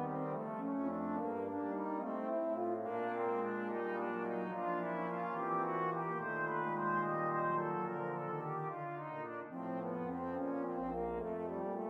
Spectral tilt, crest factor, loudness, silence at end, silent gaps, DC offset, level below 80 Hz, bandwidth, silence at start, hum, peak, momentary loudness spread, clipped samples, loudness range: -9.5 dB/octave; 14 dB; -39 LUFS; 0 s; none; under 0.1%; -70 dBFS; 5.8 kHz; 0 s; none; -24 dBFS; 5 LU; under 0.1%; 4 LU